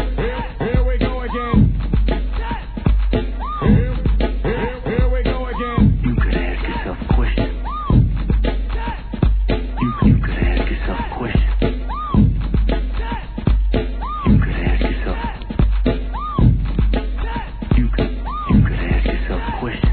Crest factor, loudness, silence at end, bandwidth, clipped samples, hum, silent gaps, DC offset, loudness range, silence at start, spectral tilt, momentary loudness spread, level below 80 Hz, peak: 16 dB; -20 LUFS; 0 s; 4.5 kHz; under 0.1%; none; none; 0.2%; 1 LU; 0 s; -11.5 dB/octave; 8 LU; -20 dBFS; 0 dBFS